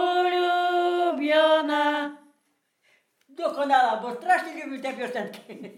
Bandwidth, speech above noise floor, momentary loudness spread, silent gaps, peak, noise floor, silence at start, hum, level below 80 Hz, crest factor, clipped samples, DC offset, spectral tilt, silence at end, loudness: 15 kHz; 48 dB; 12 LU; none; -8 dBFS; -72 dBFS; 0 s; none; under -90 dBFS; 18 dB; under 0.1%; under 0.1%; -3.5 dB/octave; 0.05 s; -24 LUFS